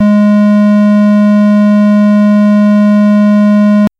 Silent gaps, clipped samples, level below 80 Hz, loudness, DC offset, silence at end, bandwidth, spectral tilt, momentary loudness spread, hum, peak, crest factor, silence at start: none; under 0.1%; -56 dBFS; -7 LUFS; under 0.1%; 0.1 s; 6 kHz; -9 dB/octave; 0 LU; none; -4 dBFS; 2 dB; 0 s